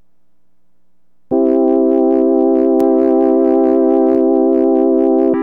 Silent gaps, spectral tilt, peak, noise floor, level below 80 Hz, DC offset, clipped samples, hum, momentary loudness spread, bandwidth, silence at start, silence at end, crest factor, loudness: none; -9.5 dB/octave; -2 dBFS; -67 dBFS; -58 dBFS; 0.6%; under 0.1%; none; 1 LU; 3 kHz; 1.3 s; 0 s; 10 dB; -12 LUFS